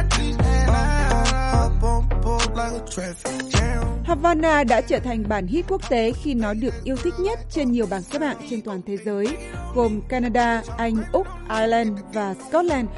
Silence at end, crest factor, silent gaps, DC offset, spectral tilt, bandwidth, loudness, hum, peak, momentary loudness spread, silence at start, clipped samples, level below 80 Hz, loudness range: 0 s; 16 dB; none; under 0.1%; -5.5 dB/octave; 11.5 kHz; -23 LUFS; none; -6 dBFS; 8 LU; 0 s; under 0.1%; -26 dBFS; 4 LU